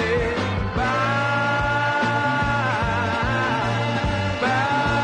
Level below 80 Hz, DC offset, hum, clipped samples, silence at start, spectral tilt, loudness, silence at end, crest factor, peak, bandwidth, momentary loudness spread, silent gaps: -36 dBFS; under 0.1%; none; under 0.1%; 0 s; -5.5 dB/octave; -21 LUFS; 0 s; 12 dB; -10 dBFS; 10 kHz; 3 LU; none